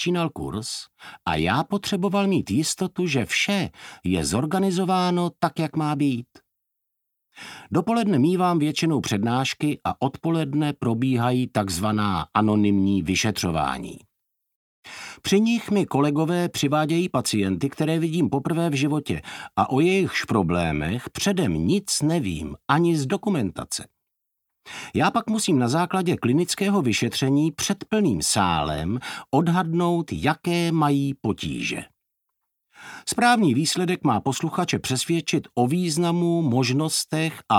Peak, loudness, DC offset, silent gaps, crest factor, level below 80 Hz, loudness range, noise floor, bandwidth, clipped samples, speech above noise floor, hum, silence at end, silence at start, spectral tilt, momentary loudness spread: -4 dBFS; -23 LUFS; under 0.1%; 14.55-14.83 s; 20 dB; -50 dBFS; 3 LU; -80 dBFS; 17 kHz; under 0.1%; 57 dB; none; 0 s; 0 s; -5 dB/octave; 8 LU